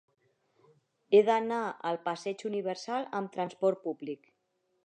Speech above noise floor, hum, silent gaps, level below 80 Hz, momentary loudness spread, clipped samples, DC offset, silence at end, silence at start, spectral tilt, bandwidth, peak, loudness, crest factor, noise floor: 47 dB; none; none; -88 dBFS; 13 LU; under 0.1%; under 0.1%; 0.7 s; 1.1 s; -5.5 dB/octave; 9.2 kHz; -12 dBFS; -31 LUFS; 20 dB; -77 dBFS